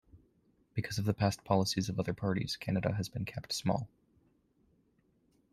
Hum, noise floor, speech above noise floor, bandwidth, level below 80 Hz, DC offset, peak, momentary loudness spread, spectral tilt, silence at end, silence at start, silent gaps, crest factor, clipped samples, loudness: none; -72 dBFS; 39 dB; 14.5 kHz; -62 dBFS; under 0.1%; -14 dBFS; 9 LU; -5.5 dB/octave; 1.65 s; 0.15 s; none; 22 dB; under 0.1%; -34 LUFS